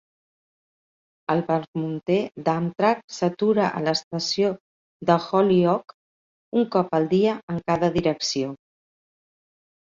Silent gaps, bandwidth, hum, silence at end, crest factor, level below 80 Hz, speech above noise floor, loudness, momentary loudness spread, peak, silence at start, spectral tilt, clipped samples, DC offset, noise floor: 1.68-1.73 s, 3.04-3.08 s, 4.04-4.11 s, 4.60-5.00 s, 5.94-6.52 s, 7.43-7.48 s; 7.6 kHz; none; 1.45 s; 20 dB; -62 dBFS; over 68 dB; -23 LUFS; 8 LU; -4 dBFS; 1.3 s; -5.5 dB/octave; under 0.1%; under 0.1%; under -90 dBFS